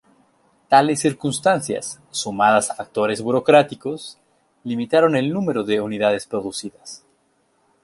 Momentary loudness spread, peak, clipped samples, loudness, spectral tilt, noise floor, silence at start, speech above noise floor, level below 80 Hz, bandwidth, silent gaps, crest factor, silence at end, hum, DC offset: 17 LU; -2 dBFS; under 0.1%; -20 LUFS; -4.5 dB/octave; -64 dBFS; 0.7 s; 44 dB; -62 dBFS; 12 kHz; none; 18 dB; 0.9 s; none; under 0.1%